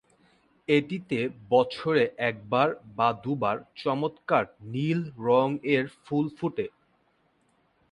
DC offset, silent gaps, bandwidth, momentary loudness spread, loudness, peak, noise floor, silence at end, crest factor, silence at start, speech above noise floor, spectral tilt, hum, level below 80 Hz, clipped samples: under 0.1%; none; 10 kHz; 7 LU; -27 LUFS; -8 dBFS; -68 dBFS; 1.25 s; 20 dB; 0.7 s; 42 dB; -7.5 dB/octave; none; -68 dBFS; under 0.1%